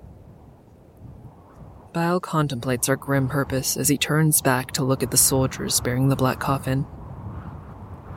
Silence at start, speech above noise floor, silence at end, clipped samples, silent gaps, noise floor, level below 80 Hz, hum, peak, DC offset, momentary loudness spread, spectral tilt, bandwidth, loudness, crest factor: 0 s; 28 dB; 0 s; under 0.1%; none; -49 dBFS; -46 dBFS; none; -2 dBFS; under 0.1%; 18 LU; -4 dB/octave; 17 kHz; -21 LUFS; 22 dB